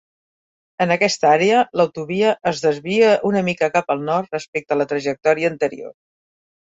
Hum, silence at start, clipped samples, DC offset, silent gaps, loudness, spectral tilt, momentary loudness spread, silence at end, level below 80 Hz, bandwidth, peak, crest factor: none; 0.8 s; under 0.1%; under 0.1%; 4.48-4.53 s; -18 LUFS; -5 dB/octave; 9 LU; 0.8 s; -62 dBFS; 8 kHz; -2 dBFS; 18 dB